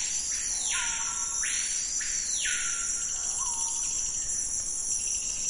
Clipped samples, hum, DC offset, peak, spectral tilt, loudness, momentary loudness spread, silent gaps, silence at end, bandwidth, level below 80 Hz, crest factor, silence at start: under 0.1%; none; under 0.1%; -16 dBFS; 2 dB/octave; -27 LUFS; 2 LU; none; 0 s; 11 kHz; -52 dBFS; 14 dB; 0 s